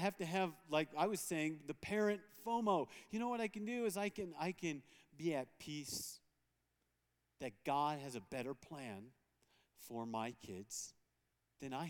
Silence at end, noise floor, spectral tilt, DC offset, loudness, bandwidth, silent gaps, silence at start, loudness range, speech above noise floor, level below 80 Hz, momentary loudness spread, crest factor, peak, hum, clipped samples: 0 s; -85 dBFS; -4.5 dB/octave; under 0.1%; -42 LUFS; 19 kHz; none; 0 s; 8 LU; 43 dB; -80 dBFS; 12 LU; 22 dB; -20 dBFS; none; under 0.1%